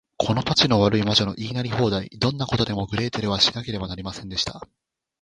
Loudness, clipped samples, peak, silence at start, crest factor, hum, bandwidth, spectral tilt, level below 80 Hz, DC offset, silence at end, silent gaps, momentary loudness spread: -22 LUFS; under 0.1%; -2 dBFS; 0.2 s; 22 dB; none; 10.5 kHz; -5 dB/octave; -46 dBFS; under 0.1%; 0.6 s; none; 12 LU